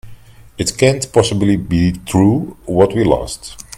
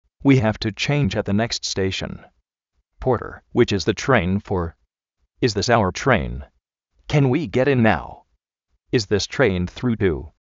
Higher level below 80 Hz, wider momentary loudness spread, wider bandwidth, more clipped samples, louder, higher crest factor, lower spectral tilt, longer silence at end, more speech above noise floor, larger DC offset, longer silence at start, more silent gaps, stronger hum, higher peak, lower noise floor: first, -36 dBFS vs -42 dBFS; about the same, 8 LU vs 8 LU; first, 16 kHz vs 7.8 kHz; neither; first, -15 LUFS vs -21 LUFS; about the same, 16 dB vs 20 dB; about the same, -5.5 dB/octave vs -5 dB/octave; about the same, 0.15 s vs 0.15 s; second, 23 dB vs 53 dB; neither; second, 0.05 s vs 0.25 s; neither; neither; about the same, 0 dBFS vs -2 dBFS; second, -37 dBFS vs -73 dBFS